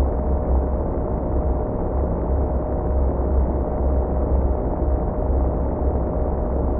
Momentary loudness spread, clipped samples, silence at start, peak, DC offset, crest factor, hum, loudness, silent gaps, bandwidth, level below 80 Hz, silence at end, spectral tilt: 2 LU; under 0.1%; 0 s; -8 dBFS; under 0.1%; 12 dB; none; -23 LUFS; none; 2.3 kHz; -22 dBFS; 0 s; -15.5 dB/octave